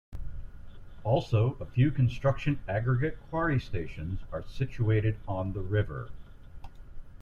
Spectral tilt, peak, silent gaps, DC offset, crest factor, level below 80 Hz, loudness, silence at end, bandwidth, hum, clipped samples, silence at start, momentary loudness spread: -8.5 dB/octave; -14 dBFS; none; under 0.1%; 16 dB; -44 dBFS; -30 LUFS; 0 s; 7 kHz; none; under 0.1%; 0.1 s; 15 LU